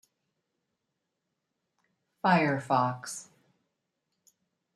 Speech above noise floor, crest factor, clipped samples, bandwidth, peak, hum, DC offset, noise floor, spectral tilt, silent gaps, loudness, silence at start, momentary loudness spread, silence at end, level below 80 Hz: 56 dB; 24 dB; under 0.1%; 13 kHz; -10 dBFS; none; under 0.1%; -84 dBFS; -5.5 dB/octave; none; -28 LUFS; 2.25 s; 15 LU; 1.5 s; -76 dBFS